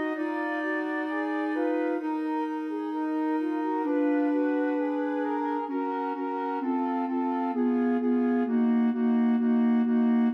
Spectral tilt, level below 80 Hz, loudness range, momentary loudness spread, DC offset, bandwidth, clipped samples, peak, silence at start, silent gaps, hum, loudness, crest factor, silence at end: -8 dB/octave; under -90 dBFS; 4 LU; 6 LU; under 0.1%; 5.2 kHz; under 0.1%; -16 dBFS; 0 s; none; none; -27 LUFS; 10 dB; 0 s